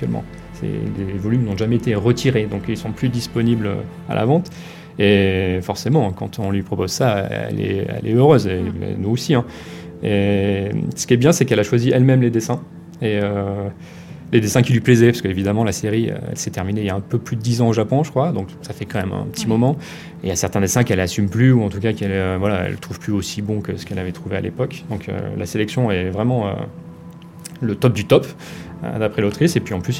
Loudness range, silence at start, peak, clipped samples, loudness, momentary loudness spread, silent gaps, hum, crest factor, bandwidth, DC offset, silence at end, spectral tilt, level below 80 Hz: 5 LU; 0 s; 0 dBFS; under 0.1%; -19 LUFS; 13 LU; none; none; 18 dB; 16 kHz; under 0.1%; 0 s; -6 dB/octave; -48 dBFS